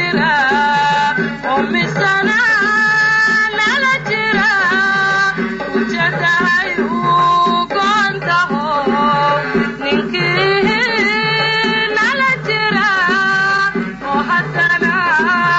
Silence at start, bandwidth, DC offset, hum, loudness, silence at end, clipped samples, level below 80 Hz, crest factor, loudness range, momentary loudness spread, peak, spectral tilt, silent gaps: 0 s; 8 kHz; under 0.1%; none; -13 LUFS; 0 s; under 0.1%; -46 dBFS; 10 dB; 2 LU; 5 LU; -4 dBFS; -4.5 dB/octave; none